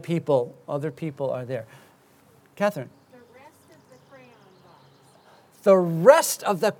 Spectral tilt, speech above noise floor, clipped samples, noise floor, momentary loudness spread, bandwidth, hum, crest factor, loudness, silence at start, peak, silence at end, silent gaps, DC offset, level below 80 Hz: -5 dB/octave; 35 dB; under 0.1%; -57 dBFS; 17 LU; 19.5 kHz; none; 24 dB; -22 LUFS; 0.05 s; 0 dBFS; 0.05 s; none; under 0.1%; -78 dBFS